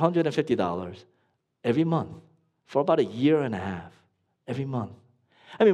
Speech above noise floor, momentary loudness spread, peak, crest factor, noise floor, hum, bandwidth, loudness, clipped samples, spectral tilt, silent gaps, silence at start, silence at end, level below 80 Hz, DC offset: 46 dB; 16 LU; -6 dBFS; 20 dB; -72 dBFS; none; 10.5 kHz; -27 LUFS; under 0.1%; -8 dB/octave; none; 0 s; 0 s; -66 dBFS; under 0.1%